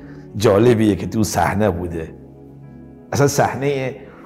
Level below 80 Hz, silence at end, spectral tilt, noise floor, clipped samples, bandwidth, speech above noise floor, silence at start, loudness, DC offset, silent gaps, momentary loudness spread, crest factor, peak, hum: -48 dBFS; 0 s; -6 dB/octave; -40 dBFS; under 0.1%; 16 kHz; 23 dB; 0 s; -18 LUFS; under 0.1%; none; 14 LU; 14 dB; -4 dBFS; none